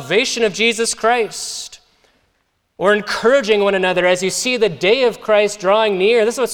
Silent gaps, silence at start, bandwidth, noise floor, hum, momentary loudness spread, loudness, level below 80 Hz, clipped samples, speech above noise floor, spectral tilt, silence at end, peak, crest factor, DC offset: none; 0 s; 17.5 kHz; -65 dBFS; none; 5 LU; -16 LUFS; -54 dBFS; under 0.1%; 50 dB; -3 dB/octave; 0 s; -2 dBFS; 16 dB; under 0.1%